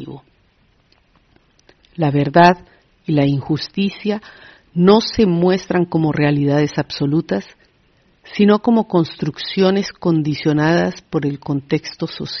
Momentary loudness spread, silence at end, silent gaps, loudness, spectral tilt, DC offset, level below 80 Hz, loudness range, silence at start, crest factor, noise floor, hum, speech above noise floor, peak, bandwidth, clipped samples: 11 LU; 0 s; none; -17 LUFS; -5.5 dB/octave; under 0.1%; -50 dBFS; 2 LU; 0 s; 18 dB; -57 dBFS; none; 41 dB; 0 dBFS; 6.4 kHz; under 0.1%